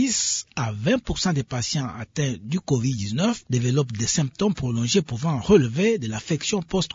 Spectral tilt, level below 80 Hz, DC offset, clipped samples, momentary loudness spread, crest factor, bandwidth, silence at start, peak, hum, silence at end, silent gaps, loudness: -4.5 dB/octave; -46 dBFS; under 0.1%; under 0.1%; 8 LU; 18 dB; 7.8 kHz; 0 s; -4 dBFS; none; 0.05 s; none; -23 LUFS